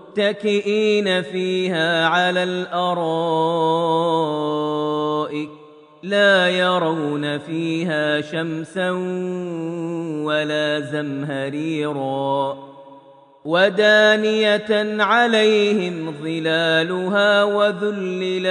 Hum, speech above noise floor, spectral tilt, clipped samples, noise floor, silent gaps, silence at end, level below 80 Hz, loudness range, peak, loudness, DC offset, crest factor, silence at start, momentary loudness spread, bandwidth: none; 28 dB; -5 dB/octave; under 0.1%; -47 dBFS; none; 0 s; -72 dBFS; 7 LU; -4 dBFS; -19 LUFS; under 0.1%; 16 dB; 0 s; 11 LU; 10 kHz